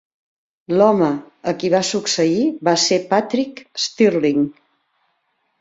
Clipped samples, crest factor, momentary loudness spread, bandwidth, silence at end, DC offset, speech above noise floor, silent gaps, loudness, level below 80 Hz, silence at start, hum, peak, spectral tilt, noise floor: under 0.1%; 18 dB; 9 LU; 8 kHz; 1.1 s; under 0.1%; 51 dB; none; -18 LUFS; -64 dBFS; 0.7 s; none; -2 dBFS; -4 dB/octave; -68 dBFS